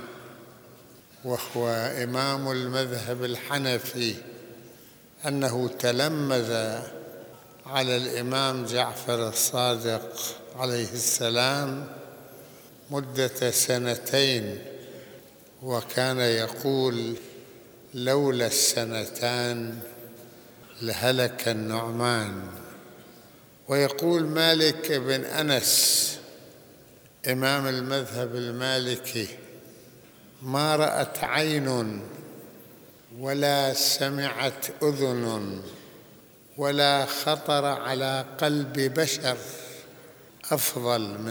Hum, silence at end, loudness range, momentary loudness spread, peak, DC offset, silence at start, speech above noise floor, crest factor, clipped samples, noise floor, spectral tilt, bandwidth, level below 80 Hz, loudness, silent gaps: none; 0 s; 5 LU; 20 LU; -4 dBFS; under 0.1%; 0 s; 26 dB; 24 dB; under 0.1%; -53 dBFS; -3 dB/octave; over 20 kHz; -70 dBFS; -26 LUFS; none